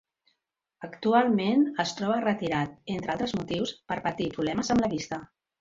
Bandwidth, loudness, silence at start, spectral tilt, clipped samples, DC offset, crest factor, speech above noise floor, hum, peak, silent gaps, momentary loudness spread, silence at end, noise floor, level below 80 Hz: 7.8 kHz; -28 LUFS; 0.8 s; -5.5 dB/octave; under 0.1%; under 0.1%; 18 dB; 53 dB; none; -10 dBFS; none; 10 LU; 0.35 s; -80 dBFS; -58 dBFS